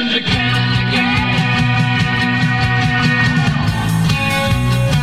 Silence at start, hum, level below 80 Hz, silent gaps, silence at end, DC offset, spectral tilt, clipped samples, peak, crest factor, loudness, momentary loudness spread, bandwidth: 0 s; none; -32 dBFS; none; 0 s; 0.8%; -5.5 dB/octave; under 0.1%; -2 dBFS; 12 dB; -14 LUFS; 2 LU; 15.5 kHz